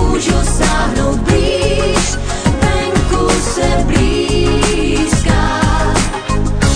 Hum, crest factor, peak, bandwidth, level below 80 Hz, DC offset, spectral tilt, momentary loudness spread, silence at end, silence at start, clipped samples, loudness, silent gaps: none; 12 dB; 0 dBFS; 10 kHz; -18 dBFS; under 0.1%; -4.5 dB/octave; 3 LU; 0 s; 0 s; under 0.1%; -14 LUFS; none